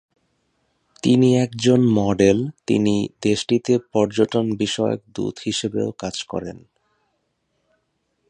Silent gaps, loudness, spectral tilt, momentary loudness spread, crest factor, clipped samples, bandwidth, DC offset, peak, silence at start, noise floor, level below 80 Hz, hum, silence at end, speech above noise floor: none; -20 LUFS; -6 dB/octave; 11 LU; 18 dB; under 0.1%; 10 kHz; under 0.1%; -2 dBFS; 1.05 s; -71 dBFS; -52 dBFS; none; 1.7 s; 51 dB